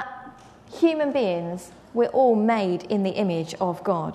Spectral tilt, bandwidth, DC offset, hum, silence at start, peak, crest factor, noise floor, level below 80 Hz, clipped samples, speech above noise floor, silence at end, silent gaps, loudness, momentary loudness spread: -7 dB/octave; 13.5 kHz; under 0.1%; none; 0 s; -8 dBFS; 16 dB; -46 dBFS; -64 dBFS; under 0.1%; 23 dB; 0 s; none; -23 LUFS; 16 LU